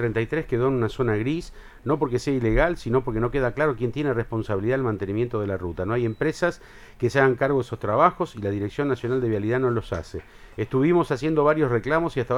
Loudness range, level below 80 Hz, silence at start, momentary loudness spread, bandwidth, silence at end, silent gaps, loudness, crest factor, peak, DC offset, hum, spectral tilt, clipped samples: 2 LU; -40 dBFS; 0 s; 8 LU; 12 kHz; 0 s; none; -24 LUFS; 20 dB; -2 dBFS; under 0.1%; none; -7.5 dB/octave; under 0.1%